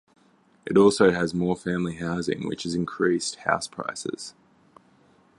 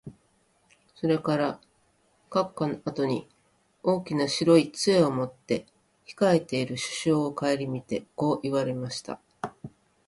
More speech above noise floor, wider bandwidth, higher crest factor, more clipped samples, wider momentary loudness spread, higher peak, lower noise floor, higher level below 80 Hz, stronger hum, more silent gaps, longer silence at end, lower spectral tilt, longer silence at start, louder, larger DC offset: second, 36 dB vs 41 dB; about the same, 11.5 kHz vs 11.5 kHz; about the same, 22 dB vs 20 dB; neither; about the same, 14 LU vs 15 LU; first, -4 dBFS vs -8 dBFS; second, -61 dBFS vs -67 dBFS; first, -56 dBFS vs -66 dBFS; neither; neither; first, 1.1 s vs 0.4 s; about the same, -5 dB/octave vs -5.5 dB/octave; first, 0.65 s vs 0.05 s; about the same, -25 LUFS vs -27 LUFS; neither